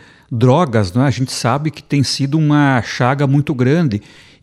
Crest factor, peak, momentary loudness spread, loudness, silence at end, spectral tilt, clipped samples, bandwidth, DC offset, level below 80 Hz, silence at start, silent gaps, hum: 14 dB; 0 dBFS; 6 LU; -15 LUFS; 0.4 s; -6 dB/octave; under 0.1%; 12.5 kHz; under 0.1%; -50 dBFS; 0.3 s; none; none